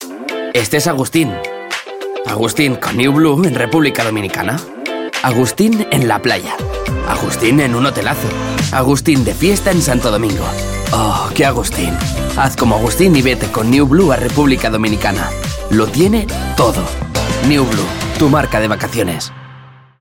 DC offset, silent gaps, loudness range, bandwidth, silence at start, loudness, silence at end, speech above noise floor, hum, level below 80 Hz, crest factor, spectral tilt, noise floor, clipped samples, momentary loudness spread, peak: under 0.1%; none; 2 LU; 17 kHz; 0 s; -14 LUFS; 0.25 s; 25 dB; none; -28 dBFS; 14 dB; -5 dB/octave; -38 dBFS; under 0.1%; 8 LU; 0 dBFS